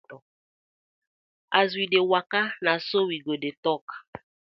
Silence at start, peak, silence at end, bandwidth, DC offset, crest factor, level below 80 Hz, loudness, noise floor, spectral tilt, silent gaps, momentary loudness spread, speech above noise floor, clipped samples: 0.1 s; -4 dBFS; 0.35 s; 6 kHz; under 0.1%; 24 dB; -74 dBFS; -25 LUFS; under -90 dBFS; -6.5 dB/octave; 0.22-1.48 s, 3.57-3.63 s, 3.81-3.88 s, 4.08-4.13 s; 9 LU; over 65 dB; under 0.1%